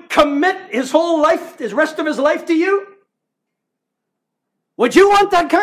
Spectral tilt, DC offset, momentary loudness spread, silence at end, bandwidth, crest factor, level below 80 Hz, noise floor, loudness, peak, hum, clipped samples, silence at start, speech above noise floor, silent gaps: -3.5 dB/octave; under 0.1%; 9 LU; 0 s; 15 kHz; 16 dB; -52 dBFS; -78 dBFS; -15 LUFS; 0 dBFS; none; under 0.1%; 0.1 s; 63 dB; none